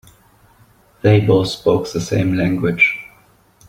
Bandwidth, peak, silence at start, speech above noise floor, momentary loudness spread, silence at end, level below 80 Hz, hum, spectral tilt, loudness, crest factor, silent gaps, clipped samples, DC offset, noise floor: 15 kHz; -2 dBFS; 1.05 s; 37 dB; 6 LU; 0.6 s; -46 dBFS; none; -6.5 dB/octave; -16 LUFS; 16 dB; none; under 0.1%; under 0.1%; -52 dBFS